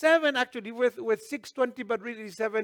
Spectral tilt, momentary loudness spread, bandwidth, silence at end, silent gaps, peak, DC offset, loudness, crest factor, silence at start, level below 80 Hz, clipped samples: -3.5 dB/octave; 9 LU; 19 kHz; 0 s; none; -10 dBFS; under 0.1%; -29 LUFS; 18 dB; 0 s; -78 dBFS; under 0.1%